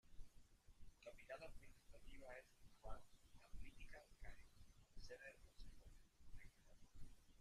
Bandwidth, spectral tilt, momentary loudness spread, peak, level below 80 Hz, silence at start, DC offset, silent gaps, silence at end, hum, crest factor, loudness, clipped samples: 14 kHz; -4.5 dB/octave; 11 LU; -38 dBFS; -64 dBFS; 0.05 s; under 0.1%; none; 0 s; none; 20 dB; -64 LUFS; under 0.1%